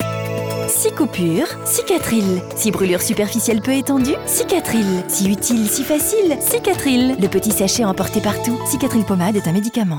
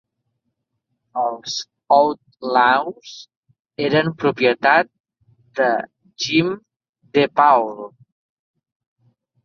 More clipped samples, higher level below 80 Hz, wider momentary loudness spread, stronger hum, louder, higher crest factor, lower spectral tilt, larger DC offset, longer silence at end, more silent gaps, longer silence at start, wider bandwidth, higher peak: neither; first, -46 dBFS vs -66 dBFS; second, 3 LU vs 20 LU; neither; about the same, -17 LUFS vs -18 LUFS; second, 12 dB vs 20 dB; about the same, -4.5 dB/octave vs -4.5 dB/octave; neither; second, 0 s vs 1.55 s; second, none vs 3.37-3.43 s, 3.60-3.65 s, 5.00-5.04 s, 6.89-6.93 s; second, 0 s vs 1.15 s; first, over 20 kHz vs 7.2 kHz; second, -6 dBFS vs -2 dBFS